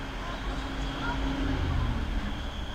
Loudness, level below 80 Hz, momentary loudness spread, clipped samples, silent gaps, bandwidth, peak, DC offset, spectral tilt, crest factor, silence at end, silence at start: -33 LUFS; -34 dBFS; 6 LU; under 0.1%; none; 10.5 kHz; -16 dBFS; under 0.1%; -6 dB/octave; 14 dB; 0 s; 0 s